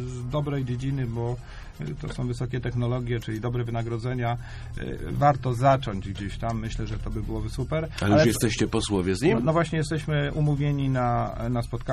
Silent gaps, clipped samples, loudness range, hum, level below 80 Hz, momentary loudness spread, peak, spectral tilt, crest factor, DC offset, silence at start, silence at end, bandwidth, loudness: none; under 0.1%; 6 LU; none; -38 dBFS; 11 LU; -8 dBFS; -6.5 dB/octave; 18 dB; under 0.1%; 0 s; 0 s; 13.5 kHz; -26 LUFS